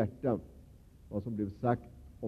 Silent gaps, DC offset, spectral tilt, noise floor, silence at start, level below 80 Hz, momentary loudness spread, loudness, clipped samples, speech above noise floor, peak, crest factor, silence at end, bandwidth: none; under 0.1%; -10 dB/octave; -56 dBFS; 0 s; -58 dBFS; 15 LU; -36 LUFS; under 0.1%; 22 dB; -14 dBFS; 22 dB; 0 s; 13 kHz